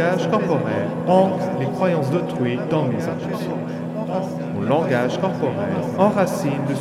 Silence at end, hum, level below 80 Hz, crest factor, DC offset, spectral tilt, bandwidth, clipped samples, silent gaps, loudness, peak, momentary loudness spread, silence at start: 0 s; none; -62 dBFS; 18 dB; under 0.1%; -7.5 dB/octave; 14.5 kHz; under 0.1%; none; -21 LUFS; -4 dBFS; 8 LU; 0 s